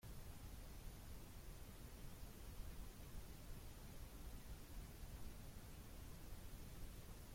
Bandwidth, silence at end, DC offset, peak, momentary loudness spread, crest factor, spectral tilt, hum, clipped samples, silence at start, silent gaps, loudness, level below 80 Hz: 16.5 kHz; 0 s; under 0.1%; -40 dBFS; 1 LU; 14 dB; -4.5 dB/octave; none; under 0.1%; 0 s; none; -58 LUFS; -58 dBFS